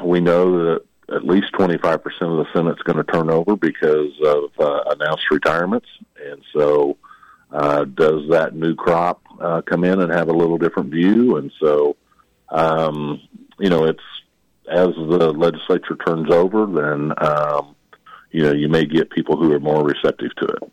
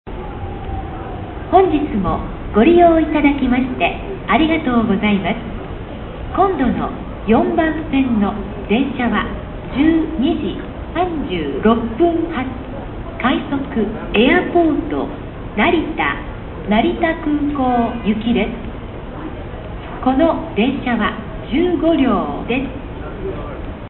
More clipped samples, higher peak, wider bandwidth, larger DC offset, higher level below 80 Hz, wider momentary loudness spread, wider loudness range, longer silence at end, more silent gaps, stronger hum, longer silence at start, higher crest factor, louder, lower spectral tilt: neither; second, -6 dBFS vs 0 dBFS; first, 9.6 kHz vs 4.2 kHz; neither; second, -54 dBFS vs -32 dBFS; second, 9 LU vs 15 LU; about the same, 2 LU vs 4 LU; about the same, 0.05 s vs 0 s; neither; neither; about the same, 0 s vs 0.05 s; second, 12 dB vs 18 dB; about the same, -18 LUFS vs -17 LUFS; second, -7.5 dB/octave vs -11 dB/octave